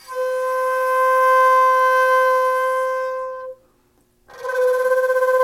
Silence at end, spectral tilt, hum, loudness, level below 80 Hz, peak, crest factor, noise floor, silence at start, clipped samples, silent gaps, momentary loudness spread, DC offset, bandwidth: 0 s; 0 dB/octave; none; -17 LUFS; -64 dBFS; -8 dBFS; 10 dB; -60 dBFS; 0.1 s; under 0.1%; none; 13 LU; under 0.1%; 16 kHz